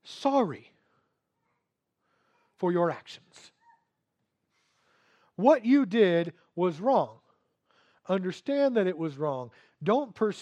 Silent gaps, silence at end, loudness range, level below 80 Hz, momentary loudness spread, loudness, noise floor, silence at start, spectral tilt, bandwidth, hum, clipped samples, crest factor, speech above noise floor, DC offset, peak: none; 0 s; 9 LU; -84 dBFS; 15 LU; -27 LUFS; -81 dBFS; 0.05 s; -7 dB/octave; 9.2 kHz; none; under 0.1%; 22 dB; 55 dB; under 0.1%; -8 dBFS